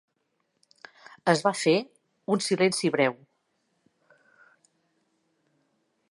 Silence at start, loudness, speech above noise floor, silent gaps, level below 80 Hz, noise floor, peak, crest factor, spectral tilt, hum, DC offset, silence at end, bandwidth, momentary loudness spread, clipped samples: 1.25 s; -25 LUFS; 51 dB; none; -80 dBFS; -76 dBFS; -6 dBFS; 24 dB; -4.5 dB/octave; none; under 0.1%; 2.95 s; 11.5 kHz; 7 LU; under 0.1%